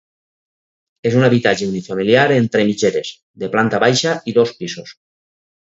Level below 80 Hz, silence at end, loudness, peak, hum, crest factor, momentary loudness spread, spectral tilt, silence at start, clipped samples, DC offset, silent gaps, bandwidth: -58 dBFS; 0.7 s; -16 LUFS; 0 dBFS; none; 18 dB; 14 LU; -5 dB/octave; 1.05 s; under 0.1%; under 0.1%; 3.23-3.34 s; 8 kHz